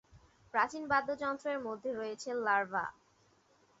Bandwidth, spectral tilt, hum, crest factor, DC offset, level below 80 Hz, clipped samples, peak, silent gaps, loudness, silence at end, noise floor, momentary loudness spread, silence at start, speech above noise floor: 7.6 kHz; -2 dB/octave; none; 20 dB; under 0.1%; -72 dBFS; under 0.1%; -16 dBFS; none; -35 LUFS; 0.9 s; -69 dBFS; 7 LU; 0.15 s; 35 dB